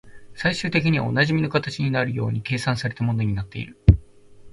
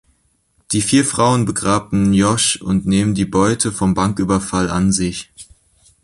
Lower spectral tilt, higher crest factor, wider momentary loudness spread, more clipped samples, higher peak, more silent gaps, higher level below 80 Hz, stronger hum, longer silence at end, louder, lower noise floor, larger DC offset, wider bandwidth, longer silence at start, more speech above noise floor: first, -6.5 dB/octave vs -4.5 dB/octave; first, 22 dB vs 16 dB; about the same, 7 LU vs 5 LU; neither; about the same, 0 dBFS vs -2 dBFS; neither; first, -32 dBFS vs -40 dBFS; neither; second, 0.05 s vs 0.6 s; second, -22 LUFS vs -16 LUFS; second, -45 dBFS vs -61 dBFS; neither; about the same, 11.5 kHz vs 11.5 kHz; second, 0.05 s vs 0.7 s; second, 22 dB vs 45 dB